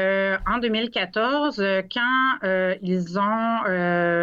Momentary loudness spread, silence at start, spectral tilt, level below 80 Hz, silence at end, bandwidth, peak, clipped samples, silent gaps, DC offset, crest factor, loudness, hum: 3 LU; 0 s; -6.5 dB/octave; -48 dBFS; 0 s; 7.4 kHz; -12 dBFS; under 0.1%; none; under 0.1%; 10 dB; -23 LUFS; none